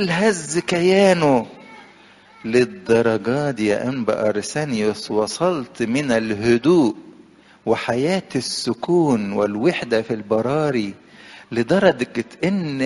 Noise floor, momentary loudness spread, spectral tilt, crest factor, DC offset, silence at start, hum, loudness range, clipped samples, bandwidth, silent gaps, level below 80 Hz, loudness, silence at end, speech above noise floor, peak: -48 dBFS; 8 LU; -5.5 dB/octave; 18 dB; under 0.1%; 0 s; none; 2 LU; under 0.1%; 11.5 kHz; none; -56 dBFS; -20 LUFS; 0 s; 29 dB; 0 dBFS